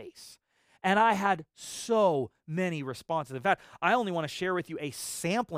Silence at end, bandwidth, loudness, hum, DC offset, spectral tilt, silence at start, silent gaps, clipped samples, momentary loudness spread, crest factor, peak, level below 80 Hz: 0 s; 15.5 kHz; -29 LUFS; none; under 0.1%; -4.5 dB/octave; 0 s; none; under 0.1%; 12 LU; 20 dB; -10 dBFS; -70 dBFS